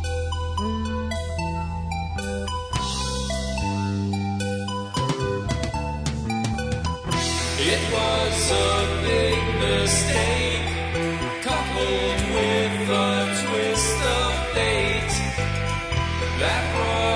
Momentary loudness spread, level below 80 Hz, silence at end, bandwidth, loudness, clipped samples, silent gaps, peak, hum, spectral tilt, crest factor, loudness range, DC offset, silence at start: 7 LU; -32 dBFS; 0 s; 11 kHz; -23 LUFS; under 0.1%; none; -8 dBFS; none; -4 dB/octave; 16 dB; 6 LU; under 0.1%; 0 s